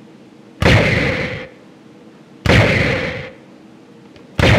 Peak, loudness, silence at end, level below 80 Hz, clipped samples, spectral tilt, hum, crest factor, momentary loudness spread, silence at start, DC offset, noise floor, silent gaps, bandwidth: 0 dBFS; -15 LUFS; 0 s; -30 dBFS; under 0.1%; -5.5 dB/octave; none; 18 dB; 17 LU; 0.6 s; under 0.1%; -42 dBFS; none; 14.5 kHz